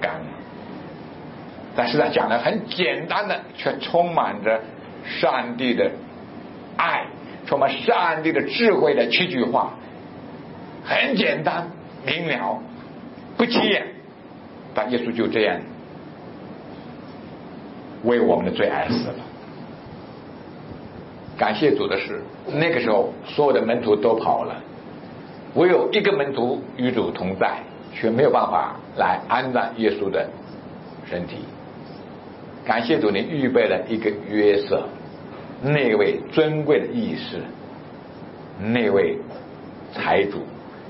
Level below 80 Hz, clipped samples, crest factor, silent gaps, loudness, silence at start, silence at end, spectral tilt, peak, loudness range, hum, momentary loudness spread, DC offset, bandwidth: -60 dBFS; under 0.1%; 18 dB; none; -22 LUFS; 0 s; 0 s; -10 dB/octave; -4 dBFS; 6 LU; none; 20 LU; under 0.1%; 5.8 kHz